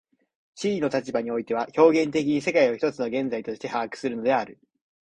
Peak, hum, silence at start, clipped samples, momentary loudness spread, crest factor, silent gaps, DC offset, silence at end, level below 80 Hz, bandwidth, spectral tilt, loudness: -4 dBFS; none; 0.55 s; under 0.1%; 11 LU; 20 dB; none; under 0.1%; 0.5 s; -66 dBFS; 9.8 kHz; -5.5 dB/octave; -25 LUFS